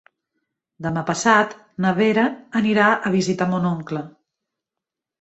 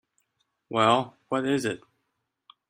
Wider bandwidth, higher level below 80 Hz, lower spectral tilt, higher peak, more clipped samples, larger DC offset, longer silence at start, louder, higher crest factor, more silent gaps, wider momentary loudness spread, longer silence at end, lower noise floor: second, 8.2 kHz vs 15.5 kHz; first, -60 dBFS vs -70 dBFS; about the same, -5.5 dB/octave vs -5 dB/octave; first, -2 dBFS vs -6 dBFS; neither; neither; about the same, 0.8 s vs 0.7 s; first, -20 LUFS vs -26 LUFS; about the same, 20 dB vs 24 dB; neither; about the same, 12 LU vs 10 LU; first, 1.1 s vs 0.9 s; first, -86 dBFS vs -79 dBFS